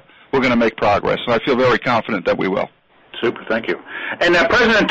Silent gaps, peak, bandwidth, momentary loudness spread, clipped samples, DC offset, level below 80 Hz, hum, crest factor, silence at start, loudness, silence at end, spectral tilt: none; -6 dBFS; 8.2 kHz; 11 LU; under 0.1%; under 0.1%; -46 dBFS; none; 12 dB; 0.35 s; -17 LUFS; 0 s; -5.5 dB/octave